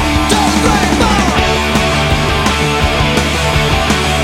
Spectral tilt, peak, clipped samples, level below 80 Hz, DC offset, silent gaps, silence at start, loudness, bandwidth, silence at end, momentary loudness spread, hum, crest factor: -4 dB/octave; 0 dBFS; under 0.1%; -20 dBFS; under 0.1%; none; 0 s; -12 LUFS; 16.5 kHz; 0 s; 2 LU; none; 12 dB